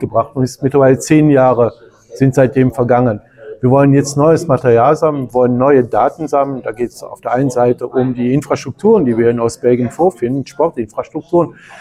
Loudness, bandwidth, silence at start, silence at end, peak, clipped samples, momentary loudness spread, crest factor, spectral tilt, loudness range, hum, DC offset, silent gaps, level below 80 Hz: -13 LUFS; 14 kHz; 0 s; 0 s; 0 dBFS; under 0.1%; 9 LU; 12 dB; -7.5 dB/octave; 3 LU; none; under 0.1%; none; -46 dBFS